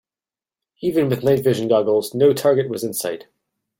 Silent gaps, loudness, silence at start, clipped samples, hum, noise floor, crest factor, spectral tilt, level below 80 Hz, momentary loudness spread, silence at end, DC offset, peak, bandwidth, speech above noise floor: none; -19 LUFS; 0.8 s; under 0.1%; none; under -90 dBFS; 16 dB; -6 dB/octave; -60 dBFS; 10 LU; 0.6 s; under 0.1%; -4 dBFS; 17 kHz; over 72 dB